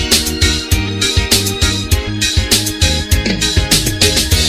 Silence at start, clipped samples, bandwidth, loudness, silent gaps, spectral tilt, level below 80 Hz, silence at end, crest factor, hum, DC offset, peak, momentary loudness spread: 0 s; under 0.1%; 18 kHz; -13 LUFS; none; -3 dB/octave; -22 dBFS; 0 s; 14 dB; none; under 0.1%; 0 dBFS; 4 LU